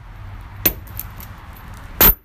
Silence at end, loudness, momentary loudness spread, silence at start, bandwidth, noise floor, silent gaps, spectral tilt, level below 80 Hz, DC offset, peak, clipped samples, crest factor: 0.1 s; -15 LUFS; 26 LU; 0.2 s; 16 kHz; -36 dBFS; none; -3 dB/octave; -30 dBFS; under 0.1%; 0 dBFS; under 0.1%; 22 dB